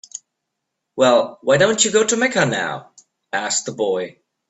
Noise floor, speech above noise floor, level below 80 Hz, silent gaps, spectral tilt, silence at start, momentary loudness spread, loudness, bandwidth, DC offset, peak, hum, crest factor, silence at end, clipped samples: -78 dBFS; 60 dB; -62 dBFS; none; -3 dB/octave; 0.15 s; 18 LU; -18 LUFS; 8.4 kHz; under 0.1%; -2 dBFS; none; 18 dB; 0.4 s; under 0.1%